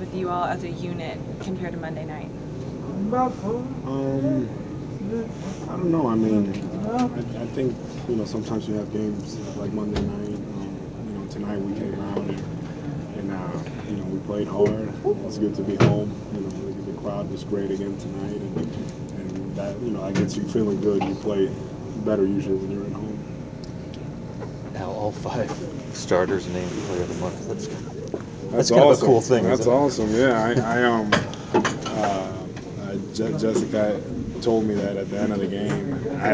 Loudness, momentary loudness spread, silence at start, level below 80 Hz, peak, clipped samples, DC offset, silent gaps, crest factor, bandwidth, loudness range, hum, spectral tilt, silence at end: -25 LUFS; 13 LU; 0 s; -46 dBFS; -2 dBFS; under 0.1%; under 0.1%; none; 22 dB; 8 kHz; 9 LU; none; -6.5 dB/octave; 0 s